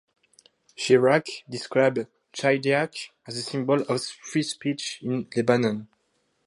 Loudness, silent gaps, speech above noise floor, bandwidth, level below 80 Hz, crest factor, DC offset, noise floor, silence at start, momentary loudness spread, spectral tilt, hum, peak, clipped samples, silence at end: -25 LUFS; none; 47 dB; 11.5 kHz; -72 dBFS; 20 dB; under 0.1%; -71 dBFS; 0.8 s; 13 LU; -5 dB/octave; none; -6 dBFS; under 0.1%; 0.6 s